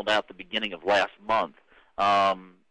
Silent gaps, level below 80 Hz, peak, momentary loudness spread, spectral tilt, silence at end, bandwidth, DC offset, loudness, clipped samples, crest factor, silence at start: none; -60 dBFS; -12 dBFS; 12 LU; -3.5 dB/octave; 0.25 s; 10 kHz; under 0.1%; -26 LUFS; under 0.1%; 14 dB; 0 s